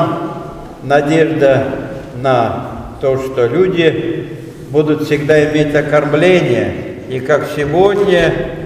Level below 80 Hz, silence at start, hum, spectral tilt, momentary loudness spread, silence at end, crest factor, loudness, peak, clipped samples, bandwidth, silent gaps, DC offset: -38 dBFS; 0 s; none; -6.5 dB/octave; 13 LU; 0 s; 14 dB; -13 LUFS; 0 dBFS; under 0.1%; 15 kHz; none; under 0.1%